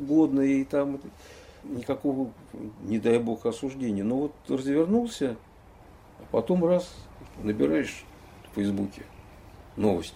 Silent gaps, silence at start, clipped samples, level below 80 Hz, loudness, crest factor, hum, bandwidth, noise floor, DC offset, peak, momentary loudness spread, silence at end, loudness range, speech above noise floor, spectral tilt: none; 0 s; under 0.1%; -54 dBFS; -28 LUFS; 18 dB; none; 15 kHz; -51 dBFS; under 0.1%; -10 dBFS; 19 LU; 0 s; 2 LU; 24 dB; -7 dB/octave